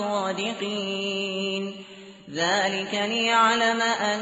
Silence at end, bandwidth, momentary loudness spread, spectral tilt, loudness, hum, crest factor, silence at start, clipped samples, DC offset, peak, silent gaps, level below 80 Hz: 0 s; 8 kHz; 16 LU; -1 dB/octave; -24 LUFS; none; 16 dB; 0 s; under 0.1%; under 0.1%; -8 dBFS; none; -70 dBFS